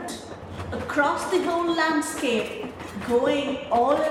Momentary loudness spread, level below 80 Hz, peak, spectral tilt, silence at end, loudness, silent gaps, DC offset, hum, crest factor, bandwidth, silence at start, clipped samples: 13 LU; -54 dBFS; -8 dBFS; -4 dB/octave; 0 s; -24 LUFS; none; under 0.1%; none; 16 dB; 16 kHz; 0 s; under 0.1%